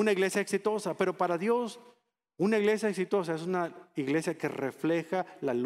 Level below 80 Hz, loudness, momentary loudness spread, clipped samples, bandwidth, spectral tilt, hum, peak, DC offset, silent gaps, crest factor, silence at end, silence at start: -80 dBFS; -31 LUFS; 7 LU; under 0.1%; 15 kHz; -5.5 dB/octave; none; -12 dBFS; under 0.1%; none; 20 dB; 0 s; 0 s